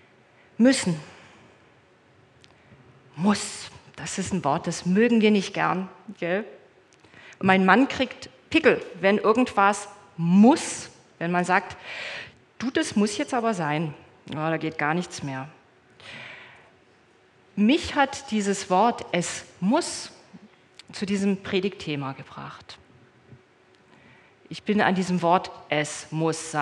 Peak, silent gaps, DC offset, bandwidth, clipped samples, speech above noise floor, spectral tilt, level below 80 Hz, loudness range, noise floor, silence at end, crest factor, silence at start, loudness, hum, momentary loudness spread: -2 dBFS; none; under 0.1%; 11.5 kHz; under 0.1%; 35 dB; -5 dB/octave; -66 dBFS; 9 LU; -58 dBFS; 0 s; 24 dB; 0.6 s; -24 LUFS; none; 19 LU